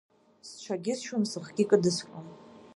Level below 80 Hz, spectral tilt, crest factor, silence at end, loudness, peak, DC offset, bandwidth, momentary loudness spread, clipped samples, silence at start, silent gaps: -74 dBFS; -5 dB/octave; 22 dB; 0.15 s; -29 LUFS; -8 dBFS; under 0.1%; 11.5 kHz; 22 LU; under 0.1%; 0.45 s; none